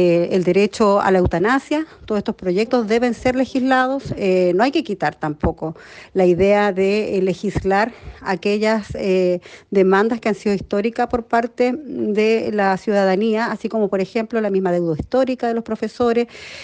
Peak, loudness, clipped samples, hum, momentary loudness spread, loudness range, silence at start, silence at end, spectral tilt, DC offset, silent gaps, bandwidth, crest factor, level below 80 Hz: -4 dBFS; -19 LUFS; under 0.1%; none; 8 LU; 1 LU; 0 s; 0 s; -6.5 dB/octave; under 0.1%; none; 9.4 kHz; 14 dB; -42 dBFS